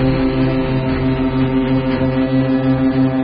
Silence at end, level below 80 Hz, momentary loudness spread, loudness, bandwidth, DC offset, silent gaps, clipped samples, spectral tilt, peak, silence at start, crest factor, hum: 0 s; -30 dBFS; 2 LU; -16 LUFS; 5.2 kHz; under 0.1%; none; under 0.1%; -7 dB/octave; -4 dBFS; 0 s; 10 dB; none